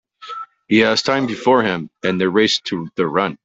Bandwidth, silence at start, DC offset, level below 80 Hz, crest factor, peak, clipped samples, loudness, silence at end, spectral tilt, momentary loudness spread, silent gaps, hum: 8.2 kHz; 0.2 s; under 0.1%; -58 dBFS; 16 dB; -2 dBFS; under 0.1%; -17 LUFS; 0.1 s; -4.5 dB/octave; 17 LU; none; none